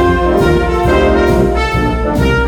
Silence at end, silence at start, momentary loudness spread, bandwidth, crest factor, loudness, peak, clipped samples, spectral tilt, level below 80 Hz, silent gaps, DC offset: 0 s; 0 s; 3 LU; 17 kHz; 10 dB; -12 LUFS; 0 dBFS; under 0.1%; -7 dB/octave; -18 dBFS; none; under 0.1%